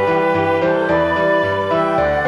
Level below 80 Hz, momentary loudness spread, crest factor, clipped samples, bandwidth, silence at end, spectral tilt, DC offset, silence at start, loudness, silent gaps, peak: -42 dBFS; 1 LU; 10 dB; under 0.1%; 12 kHz; 0 s; -7 dB/octave; under 0.1%; 0 s; -16 LUFS; none; -4 dBFS